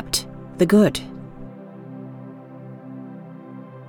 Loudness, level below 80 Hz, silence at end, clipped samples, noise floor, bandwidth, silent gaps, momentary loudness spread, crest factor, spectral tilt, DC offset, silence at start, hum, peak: -19 LUFS; -48 dBFS; 0.05 s; under 0.1%; -39 dBFS; 18 kHz; none; 23 LU; 20 dB; -5 dB/octave; under 0.1%; 0 s; none; -4 dBFS